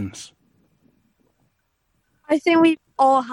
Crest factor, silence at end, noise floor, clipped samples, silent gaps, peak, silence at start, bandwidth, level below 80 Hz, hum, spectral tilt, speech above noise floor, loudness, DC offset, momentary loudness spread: 18 dB; 0 s; -70 dBFS; under 0.1%; none; -6 dBFS; 0 s; 11.5 kHz; -66 dBFS; none; -5 dB/octave; 52 dB; -18 LUFS; under 0.1%; 22 LU